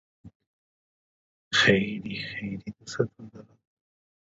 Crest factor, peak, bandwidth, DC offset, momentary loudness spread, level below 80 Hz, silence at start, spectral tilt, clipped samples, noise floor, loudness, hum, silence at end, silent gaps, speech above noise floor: 24 dB; -6 dBFS; 8 kHz; under 0.1%; 18 LU; -60 dBFS; 0.25 s; -4.5 dB/octave; under 0.1%; under -90 dBFS; -26 LUFS; none; 0.8 s; 0.35-0.40 s, 0.47-1.51 s; over 61 dB